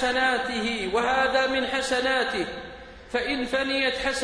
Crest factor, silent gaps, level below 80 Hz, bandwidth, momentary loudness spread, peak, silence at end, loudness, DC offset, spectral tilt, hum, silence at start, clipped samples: 16 dB; none; -50 dBFS; 10.5 kHz; 9 LU; -10 dBFS; 0 s; -25 LUFS; under 0.1%; -2.5 dB/octave; none; 0 s; under 0.1%